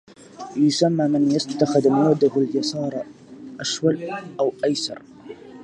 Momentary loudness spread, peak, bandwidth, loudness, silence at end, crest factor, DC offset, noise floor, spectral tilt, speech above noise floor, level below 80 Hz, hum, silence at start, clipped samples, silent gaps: 21 LU; -4 dBFS; 11 kHz; -21 LUFS; 0 s; 18 dB; under 0.1%; -40 dBFS; -5.5 dB/octave; 20 dB; -66 dBFS; none; 0.2 s; under 0.1%; none